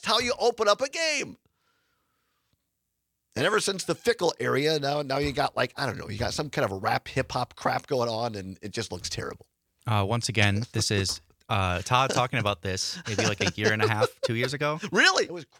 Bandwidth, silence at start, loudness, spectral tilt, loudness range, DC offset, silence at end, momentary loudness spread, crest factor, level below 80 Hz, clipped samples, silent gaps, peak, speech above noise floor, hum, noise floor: 16.5 kHz; 0.05 s; -26 LUFS; -4 dB/octave; 4 LU; under 0.1%; 0.15 s; 9 LU; 22 dB; -56 dBFS; under 0.1%; none; -4 dBFS; 53 dB; none; -80 dBFS